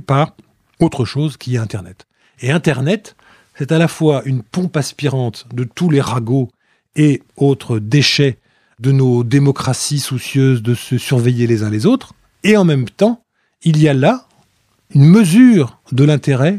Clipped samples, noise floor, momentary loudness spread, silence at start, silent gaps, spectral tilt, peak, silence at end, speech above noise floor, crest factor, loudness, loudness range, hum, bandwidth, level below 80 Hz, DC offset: under 0.1%; -58 dBFS; 10 LU; 0.1 s; none; -6.5 dB/octave; 0 dBFS; 0 s; 45 dB; 14 dB; -14 LUFS; 6 LU; none; 14 kHz; -54 dBFS; under 0.1%